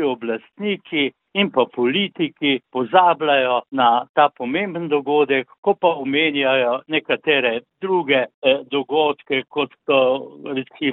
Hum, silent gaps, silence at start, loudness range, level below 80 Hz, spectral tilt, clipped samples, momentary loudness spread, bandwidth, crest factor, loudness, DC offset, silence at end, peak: none; 4.09-4.14 s, 5.58-5.63 s, 8.34-8.42 s; 0 s; 2 LU; -68 dBFS; -9.5 dB/octave; under 0.1%; 8 LU; 4.1 kHz; 20 dB; -19 LUFS; under 0.1%; 0 s; 0 dBFS